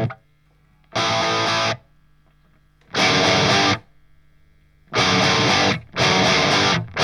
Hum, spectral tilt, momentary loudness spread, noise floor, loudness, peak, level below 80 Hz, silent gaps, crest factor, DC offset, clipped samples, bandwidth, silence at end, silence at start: none; -3.5 dB/octave; 10 LU; -57 dBFS; -18 LUFS; -4 dBFS; -50 dBFS; none; 16 dB; under 0.1%; under 0.1%; 14.5 kHz; 0 s; 0 s